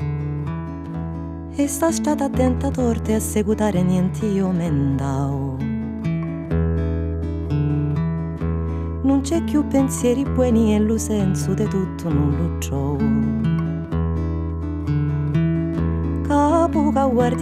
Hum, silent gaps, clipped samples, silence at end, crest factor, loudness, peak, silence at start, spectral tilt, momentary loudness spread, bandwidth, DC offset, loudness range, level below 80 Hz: none; none; under 0.1%; 0 s; 14 dB; -21 LUFS; -6 dBFS; 0 s; -7 dB/octave; 8 LU; 15 kHz; under 0.1%; 3 LU; -36 dBFS